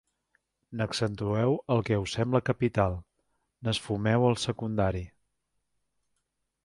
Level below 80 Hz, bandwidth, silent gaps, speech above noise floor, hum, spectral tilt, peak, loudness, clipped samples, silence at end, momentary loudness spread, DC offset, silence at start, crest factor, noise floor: -50 dBFS; 11.5 kHz; none; 52 dB; none; -6 dB/octave; -10 dBFS; -29 LUFS; under 0.1%; 1.55 s; 11 LU; under 0.1%; 0.7 s; 20 dB; -80 dBFS